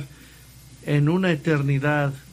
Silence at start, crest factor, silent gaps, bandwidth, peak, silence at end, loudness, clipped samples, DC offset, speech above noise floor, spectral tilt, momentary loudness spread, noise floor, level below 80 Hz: 0 s; 16 dB; none; 15 kHz; -6 dBFS; 0.1 s; -22 LUFS; under 0.1%; under 0.1%; 26 dB; -7.5 dB/octave; 10 LU; -47 dBFS; -52 dBFS